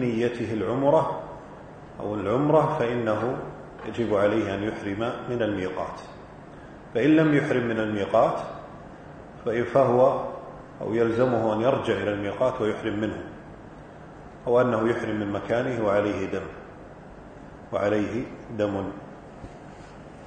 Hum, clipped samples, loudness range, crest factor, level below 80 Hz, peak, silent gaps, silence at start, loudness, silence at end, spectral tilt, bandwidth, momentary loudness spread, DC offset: none; under 0.1%; 4 LU; 20 dB; -54 dBFS; -6 dBFS; none; 0 s; -25 LUFS; 0 s; -7.5 dB/octave; 9.2 kHz; 23 LU; under 0.1%